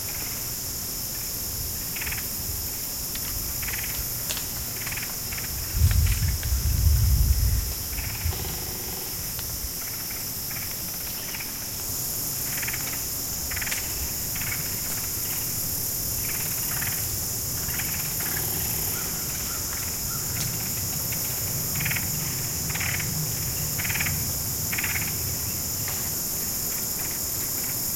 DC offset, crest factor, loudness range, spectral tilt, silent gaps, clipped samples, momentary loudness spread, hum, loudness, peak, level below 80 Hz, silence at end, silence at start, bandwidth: under 0.1%; 20 dB; 3 LU; -2.5 dB/octave; none; under 0.1%; 5 LU; none; -26 LUFS; -8 dBFS; -34 dBFS; 0 s; 0 s; 16.5 kHz